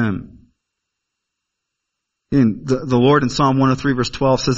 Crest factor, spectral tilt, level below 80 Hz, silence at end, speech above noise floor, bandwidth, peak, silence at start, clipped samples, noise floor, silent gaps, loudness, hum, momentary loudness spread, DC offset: 18 dB; -6.5 dB/octave; -42 dBFS; 0 s; 63 dB; 7.8 kHz; 0 dBFS; 0 s; under 0.1%; -79 dBFS; none; -17 LUFS; none; 7 LU; under 0.1%